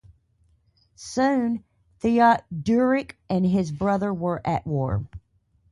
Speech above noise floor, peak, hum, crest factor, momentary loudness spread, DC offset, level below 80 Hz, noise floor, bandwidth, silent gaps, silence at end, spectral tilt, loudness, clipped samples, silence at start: 41 dB; -6 dBFS; none; 18 dB; 11 LU; under 0.1%; -50 dBFS; -64 dBFS; 11.5 kHz; none; 0.55 s; -7 dB/octave; -24 LUFS; under 0.1%; 1 s